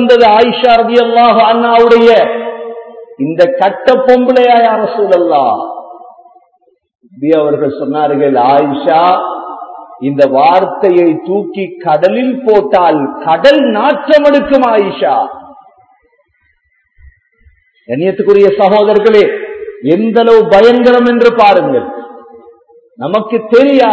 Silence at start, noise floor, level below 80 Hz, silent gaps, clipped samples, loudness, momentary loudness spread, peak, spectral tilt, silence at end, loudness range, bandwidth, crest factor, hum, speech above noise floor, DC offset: 0 s; -57 dBFS; -50 dBFS; none; 2%; -9 LUFS; 14 LU; 0 dBFS; -6.5 dB/octave; 0 s; 6 LU; 8 kHz; 10 dB; none; 49 dB; under 0.1%